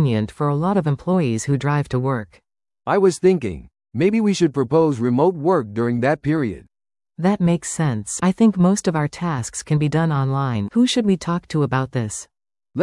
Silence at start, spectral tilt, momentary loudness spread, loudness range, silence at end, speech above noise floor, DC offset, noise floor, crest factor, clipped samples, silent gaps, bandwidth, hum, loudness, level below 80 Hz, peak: 0 s; -6.5 dB/octave; 8 LU; 2 LU; 0 s; 37 dB; under 0.1%; -56 dBFS; 16 dB; under 0.1%; none; 12 kHz; none; -20 LUFS; -50 dBFS; -4 dBFS